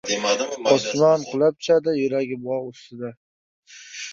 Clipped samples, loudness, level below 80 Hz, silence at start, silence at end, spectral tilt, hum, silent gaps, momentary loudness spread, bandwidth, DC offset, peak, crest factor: under 0.1%; -21 LUFS; -68 dBFS; 0.05 s; 0 s; -4 dB/octave; none; 3.17-3.63 s; 17 LU; 7.8 kHz; under 0.1%; -2 dBFS; 20 dB